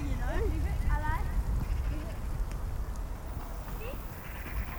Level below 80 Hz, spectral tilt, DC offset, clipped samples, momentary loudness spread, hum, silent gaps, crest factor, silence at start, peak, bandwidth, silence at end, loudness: -34 dBFS; -6.5 dB/octave; under 0.1%; under 0.1%; 8 LU; none; none; 16 dB; 0 s; -16 dBFS; over 20 kHz; 0 s; -36 LUFS